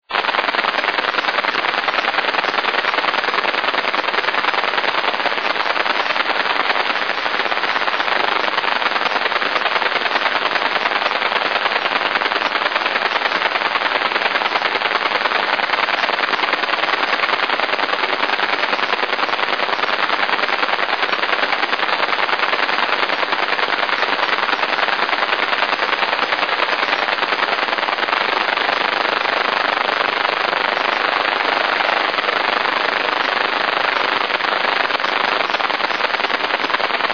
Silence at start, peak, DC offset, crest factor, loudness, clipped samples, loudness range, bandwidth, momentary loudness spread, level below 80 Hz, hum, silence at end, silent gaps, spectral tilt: 0.1 s; 0 dBFS; 0.4%; 18 dB; -17 LUFS; under 0.1%; 1 LU; 5.4 kHz; 1 LU; -70 dBFS; none; 0 s; none; -2 dB/octave